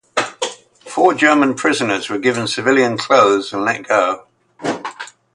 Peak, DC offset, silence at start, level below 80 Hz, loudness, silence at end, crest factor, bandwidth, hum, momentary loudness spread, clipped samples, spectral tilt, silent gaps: 0 dBFS; under 0.1%; 0.15 s; -62 dBFS; -16 LUFS; 0.3 s; 16 dB; 11.5 kHz; none; 14 LU; under 0.1%; -3.5 dB/octave; none